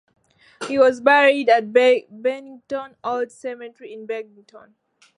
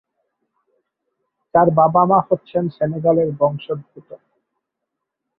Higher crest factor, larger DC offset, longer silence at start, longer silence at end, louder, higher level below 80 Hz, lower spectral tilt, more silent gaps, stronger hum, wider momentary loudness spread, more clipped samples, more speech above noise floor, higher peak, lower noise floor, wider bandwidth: about the same, 18 dB vs 18 dB; neither; second, 0.6 s vs 1.55 s; second, 0.6 s vs 1.2 s; about the same, -19 LUFS vs -17 LUFS; second, -72 dBFS vs -60 dBFS; second, -3.5 dB/octave vs -12 dB/octave; neither; neither; first, 20 LU vs 12 LU; neither; second, 17 dB vs 63 dB; about the same, -2 dBFS vs -2 dBFS; second, -37 dBFS vs -80 dBFS; first, 11 kHz vs 4.7 kHz